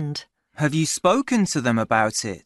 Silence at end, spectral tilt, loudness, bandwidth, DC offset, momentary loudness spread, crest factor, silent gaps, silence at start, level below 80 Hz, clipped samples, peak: 0.05 s; -4.5 dB/octave; -21 LUFS; 12 kHz; under 0.1%; 7 LU; 18 dB; none; 0 s; -60 dBFS; under 0.1%; -4 dBFS